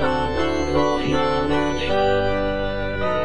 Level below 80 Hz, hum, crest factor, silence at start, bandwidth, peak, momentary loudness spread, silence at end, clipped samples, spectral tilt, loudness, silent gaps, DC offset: -34 dBFS; none; 14 dB; 0 s; 10 kHz; -8 dBFS; 4 LU; 0 s; under 0.1%; -6 dB/octave; -21 LUFS; none; 3%